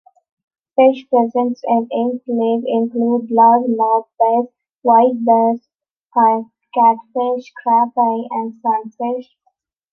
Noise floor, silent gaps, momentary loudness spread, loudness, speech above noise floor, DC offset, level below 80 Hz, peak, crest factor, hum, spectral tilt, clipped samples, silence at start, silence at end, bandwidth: -66 dBFS; 4.76-4.82 s, 5.91-6.07 s; 10 LU; -16 LUFS; 50 dB; under 0.1%; -74 dBFS; -2 dBFS; 14 dB; none; -8 dB/octave; under 0.1%; 0.8 s; 0.7 s; 6 kHz